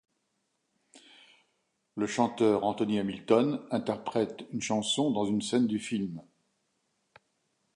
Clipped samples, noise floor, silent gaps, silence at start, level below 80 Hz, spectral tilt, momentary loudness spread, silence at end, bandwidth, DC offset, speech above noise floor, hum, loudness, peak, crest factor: under 0.1%; -78 dBFS; none; 0.95 s; -70 dBFS; -5 dB/octave; 9 LU; 1.55 s; 11.5 kHz; under 0.1%; 49 dB; none; -30 LUFS; -10 dBFS; 22 dB